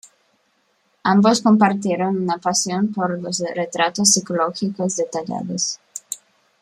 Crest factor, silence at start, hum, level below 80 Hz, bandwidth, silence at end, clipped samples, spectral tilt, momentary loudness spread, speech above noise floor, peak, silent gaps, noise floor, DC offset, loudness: 20 dB; 1.05 s; none; -66 dBFS; 14.5 kHz; 0.45 s; under 0.1%; -3.5 dB/octave; 11 LU; 45 dB; 0 dBFS; none; -64 dBFS; under 0.1%; -19 LUFS